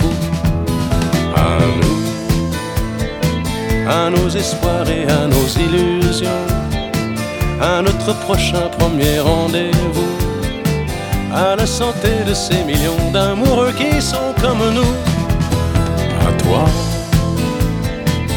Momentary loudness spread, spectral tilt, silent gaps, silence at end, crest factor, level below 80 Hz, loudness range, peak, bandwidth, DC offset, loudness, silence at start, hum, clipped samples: 5 LU; -5.5 dB/octave; none; 0 s; 14 dB; -24 dBFS; 2 LU; 0 dBFS; over 20 kHz; under 0.1%; -16 LUFS; 0 s; none; under 0.1%